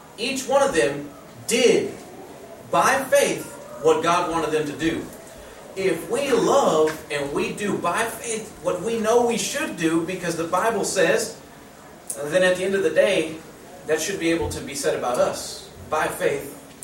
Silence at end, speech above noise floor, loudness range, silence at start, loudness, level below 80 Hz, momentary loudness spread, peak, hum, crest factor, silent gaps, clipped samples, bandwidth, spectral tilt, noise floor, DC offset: 0 s; 22 dB; 2 LU; 0 s; -22 LUFS; -54 dBFS; 18 LU; -6 dBFS; none; 18 dB; none; under 0.1%; 16.5 kHz; -3.5 dB/octave; -44 dBFS; under 0.1%